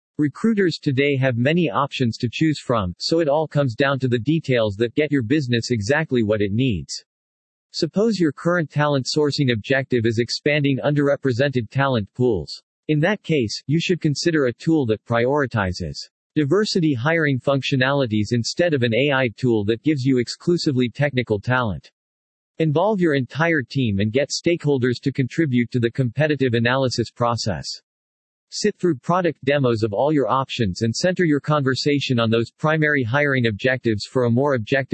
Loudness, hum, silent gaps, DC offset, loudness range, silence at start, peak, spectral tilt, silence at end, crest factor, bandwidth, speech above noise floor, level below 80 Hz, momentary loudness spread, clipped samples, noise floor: -20 LUFS; none; 7.06-7.70 s, 12.63-12.83 s, 16.11-16.30 s, 21.93-22.55 s, 27.83-28.47 s; under 0.1%; 2 LU; 0.2 s; -4 dBFS; -6 dB/octave; 0.1 s; 16 dB; 8.8 kHz; over 70 dB; -56 dBFS; 4 LU; under 0.1%; under -90 dBFS